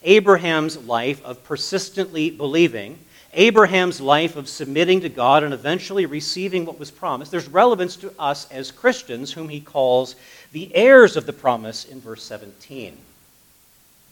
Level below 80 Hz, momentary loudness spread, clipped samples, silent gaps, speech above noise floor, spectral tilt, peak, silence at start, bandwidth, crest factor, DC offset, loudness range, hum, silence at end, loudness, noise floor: -66 dBFS; 21 LU; under 0.1%; none; 35 dB; -4.5 dB/octave; 0 dBFS; 0.05 s; 18.5 kHz; 20 dB; under 0.1%; 5 LU; none; 1.2 s; -18 LUFS; -54 dBFS